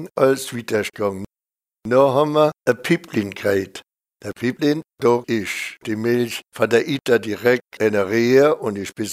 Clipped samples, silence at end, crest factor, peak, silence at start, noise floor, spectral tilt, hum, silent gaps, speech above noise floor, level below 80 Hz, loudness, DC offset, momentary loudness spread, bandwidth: under 0.1%; 0 s; 18 dB; -2 dBFS; 0 s; under -90 dBFS; -5.5 dB/octave; none; none; over 71 dB; -62 dBFS; -20 LUFS; under 0.1%; 11 LU; 16 kHz